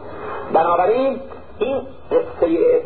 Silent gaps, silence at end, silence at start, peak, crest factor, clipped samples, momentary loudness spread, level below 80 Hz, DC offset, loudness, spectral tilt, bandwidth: none; 0 s; 0 s; -4 dBFS; 14 dB; under 0.1%; 14 LU; -48 dBFS; 1%; -19 LUFS; -11 dB/octave; 4.4 kHz